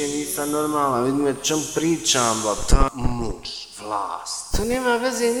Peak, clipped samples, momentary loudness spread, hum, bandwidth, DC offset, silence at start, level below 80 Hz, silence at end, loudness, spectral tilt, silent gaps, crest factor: -2 dBFS; under 0.1%; 10 LU; none; 19 kHz; under 0.1%; 0 s; -28 dBFS; 0 s; -22 LUFS; -3.5 dB/octave; none; 20 dB